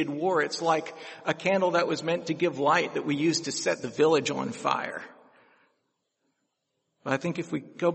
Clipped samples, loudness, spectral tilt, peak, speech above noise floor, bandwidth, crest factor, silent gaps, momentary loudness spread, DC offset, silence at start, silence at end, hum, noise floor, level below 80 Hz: under 0.1%; -27 LUFS; -4.5 dB/octave; -8 dBFS; 52 dB; 8.4 kHz; 20 dB; none; 11 LU; under 0.1%; 0 s; 0 s; none; -79 dBFS; -74 dBFS